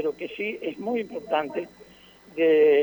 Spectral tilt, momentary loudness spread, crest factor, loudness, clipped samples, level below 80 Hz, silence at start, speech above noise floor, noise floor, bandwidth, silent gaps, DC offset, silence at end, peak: -6 dB/octave; 15 LU; 14 dB; -26 LUFS; under 0.1%; -68 dBFS; 0 s; 28 dB; -52 dBFS; over 20 kHz; none; under 0.1%; 0 s; -10 dBFS